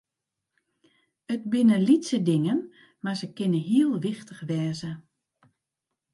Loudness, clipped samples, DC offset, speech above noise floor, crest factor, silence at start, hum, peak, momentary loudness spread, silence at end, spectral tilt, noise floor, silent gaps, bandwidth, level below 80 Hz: -25 LUFS; under 0.1%; under 0.1%; 61 dB; 18 dB; 1.3 s; none; -10 dBFS; 15 LU; 1.15 s; -7 dB/octave; -85 dBFS; none; 11.5 kHz; -72 dBFS